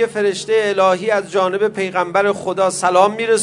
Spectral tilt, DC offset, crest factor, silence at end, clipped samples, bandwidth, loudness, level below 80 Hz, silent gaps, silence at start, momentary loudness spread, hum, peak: -3.5 dB/octave; under 0.1%; 16 dB; 0 s; under 0.1%; 11 kHz; -16 LUFS; -62 dBFS; none; 0 s; 4 LU; none; 0 dBFS